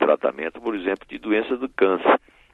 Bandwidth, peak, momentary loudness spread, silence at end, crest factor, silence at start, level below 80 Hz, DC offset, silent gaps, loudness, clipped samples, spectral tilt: 4.4 kHz; -4 dBFS; 8 LU; 0.35 s; 18 dB; 0 s; -58 dBFS; under 0.1%; none; -23 LUFS; under 0.1%; -7 dB/octave